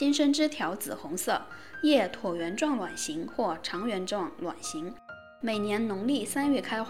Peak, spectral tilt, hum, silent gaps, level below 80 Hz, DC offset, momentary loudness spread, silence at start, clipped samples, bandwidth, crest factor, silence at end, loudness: -12 dBFS; -3.5 dB/octave; none; none; -66 dBFS; 0.3%; 11 LU; 0 s; under 0.1%; 16 kHz; 18 dB; 0 s; -30 LUFS